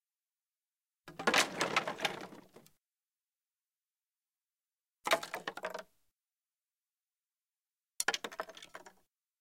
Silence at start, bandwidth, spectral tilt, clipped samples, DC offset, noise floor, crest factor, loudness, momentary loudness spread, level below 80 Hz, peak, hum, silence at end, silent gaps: 1.05 s; 16.5 kHz; -1.5 dB/octave; under 0.1%; under 0.1%; under -90 dBFS; 26 dB; -35 LUFS; 22 LU; -82 dBFS; -14 dBFS; none; 0.5 s; none